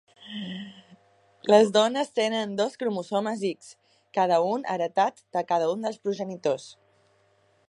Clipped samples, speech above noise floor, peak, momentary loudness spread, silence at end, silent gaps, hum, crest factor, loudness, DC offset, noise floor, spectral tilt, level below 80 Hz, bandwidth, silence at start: under 0.1%; 40 dB; -4 dBFS; 15 LU; 0.95 s; none; none; 22 dB; -26 LUFS; under 0.1%; -65 dBFS; -4.5 dB/octave; -78 dBFS; 11 kHz; 0.2 s